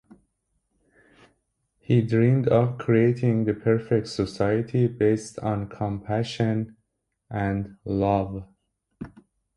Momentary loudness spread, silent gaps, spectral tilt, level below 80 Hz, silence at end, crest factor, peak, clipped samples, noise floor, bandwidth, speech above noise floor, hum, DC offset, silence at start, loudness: 13 LU; none; -8 dB/octave; -50 dBFS; 0.5 s; 18 dB; -8 dBFS; under 0.1%; -77 dBFS; 11 kHz; 54 dB; none; under 0.1%; 1.9 s; -24 LUFS